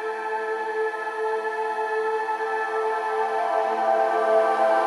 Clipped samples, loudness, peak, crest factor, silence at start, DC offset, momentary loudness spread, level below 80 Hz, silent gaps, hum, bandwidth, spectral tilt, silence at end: under 0.1%; -24 LUFS; -10 dBFS; 14 dB; 0 s; under 0.1%; 7 LU; under -90 dBFS; none; none; 11.5 kHz; -2.5 dB/octave; 0 s